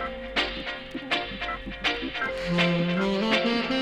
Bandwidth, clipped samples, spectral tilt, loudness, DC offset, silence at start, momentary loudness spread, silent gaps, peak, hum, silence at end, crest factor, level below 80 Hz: 10.5 kHz; under 0.1%; -5.5 dB/octave; -27 LUFS; under 0.1%; 0 s; 9 LU; none; -10 dBFS; none; 0 s; 18 dB; -46 dBFS